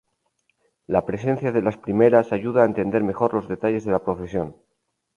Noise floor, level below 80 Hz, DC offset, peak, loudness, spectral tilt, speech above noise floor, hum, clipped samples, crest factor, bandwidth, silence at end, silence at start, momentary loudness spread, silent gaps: -70 dBFS; -52 dBFS; under 0.1%; -2 dBFS; -22 LUFS; -9 dB/octave; 49 dB; none; under 0.1%; 20 dB; 7 kHz; 0.65 s; 0.9 s; 10 LU; none